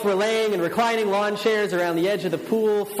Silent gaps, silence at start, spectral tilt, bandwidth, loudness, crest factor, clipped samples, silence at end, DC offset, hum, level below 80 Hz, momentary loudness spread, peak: none; 0 s; -4.5 dB/octave; 15.5 kHz; -22 LUFS; 12 dB; under 0.1%; 0 s; under 0.1%; none; -68 dBFS; 2 LU; -10 dBFS